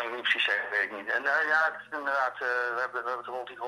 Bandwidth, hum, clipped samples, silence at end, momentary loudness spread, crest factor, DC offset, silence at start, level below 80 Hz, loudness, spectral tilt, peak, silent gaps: 13 kHz; none; under 0.1%; 0 s; 9 LU; 18 dB; under 0.1%; 0 s; -86 dBFS; -28 LUFS; -2 dB/octave; -12 dBFS; none